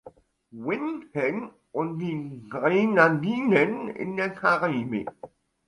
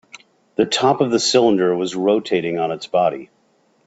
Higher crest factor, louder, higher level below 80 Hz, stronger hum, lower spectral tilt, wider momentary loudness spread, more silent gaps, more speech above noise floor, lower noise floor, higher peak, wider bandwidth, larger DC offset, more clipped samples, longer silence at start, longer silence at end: about the same, 20 dB vs 16 dB; second, -25 LUFS vs -18 LUFS; about the same, -66 dBFS vs -62 dBFS; neither; first, -7.5 dB/octave vs -4 dB/octave; first, 14 LU vs 7 LU; neither; second, 26 dB vs 43 dB; second, -51 dBFS vs -60 dBFS; second, -6 dBFS vs -2 dBFS; first, 11 kHz vs 8.2 kHz; neither; neither; about the same, 0.05 s vs 0.15 s; second, 0.4 s vs 0.6 s